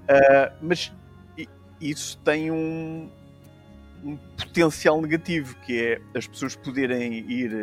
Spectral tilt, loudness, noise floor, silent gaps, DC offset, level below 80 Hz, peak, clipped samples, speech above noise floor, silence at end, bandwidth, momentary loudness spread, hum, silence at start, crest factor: -5 dB/octave; -24 LUFS; -49 dBFS; none; under 0.1%; -56 dBFS; -6 dBFS; under 0.1%; 25 dB; 0 s; 15 kHz; 19 LU; none; 0 s; 20 dB